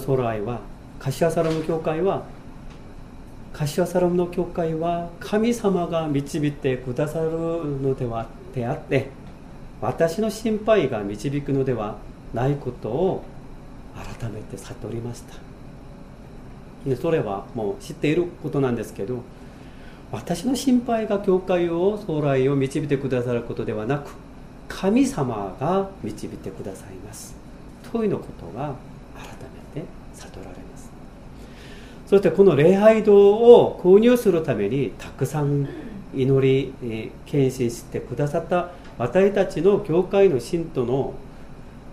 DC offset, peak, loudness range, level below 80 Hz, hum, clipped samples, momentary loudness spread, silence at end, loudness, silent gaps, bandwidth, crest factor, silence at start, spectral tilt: under 0.1%; 0 dBFS; 15 LU; -44 dBFS; none; under 0.1%; 24 LU; 0 s; -22 LUFS; none; 15.5 kHz; 22 dB; 0 s; -7 dB/octave